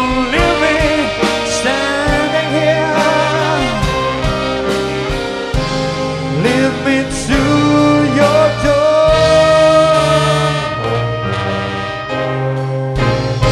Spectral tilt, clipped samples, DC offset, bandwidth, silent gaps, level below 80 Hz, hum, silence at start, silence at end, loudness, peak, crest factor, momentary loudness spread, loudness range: -5 dB/octave; under 0.1%; under 0.1%; 13.5 kHz; none; -28 dBFS; none; 0 s; 0 s; -13 LUFS; 0 dBFS; 12 dB; 8 LU; 5 LU